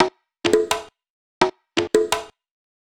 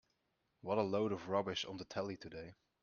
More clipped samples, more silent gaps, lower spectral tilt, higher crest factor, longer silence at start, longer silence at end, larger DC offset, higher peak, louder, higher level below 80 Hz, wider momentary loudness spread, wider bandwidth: neither; first, 1.10-1.41 s vs none; about the same, -3 dB/octave vs -4 dB/octave; about the same, 20 dB vs 20 dB; second, 0 s vs 0.65 s; first, 0.55 s vs 0.3 s; neither; first, -2 dBFS vs -20 dBFS; first, -22 LUFS vs -40 LUFS; first, -54 dBFS vs -74 dBFS; second, 6 LU vs 15 LU; first, 18 kHz vs 7 kHz